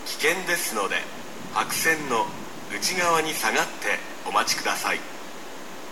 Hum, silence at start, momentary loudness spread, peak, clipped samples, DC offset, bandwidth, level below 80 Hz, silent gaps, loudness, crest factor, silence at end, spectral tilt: none; 0 s; 16 LU; -6 dBFS; under 0.1%; 1%; 17.5 kHz; -68 dBFS; none; -24 LUFS; 20 dB; 0 s; -1.5 dB/octave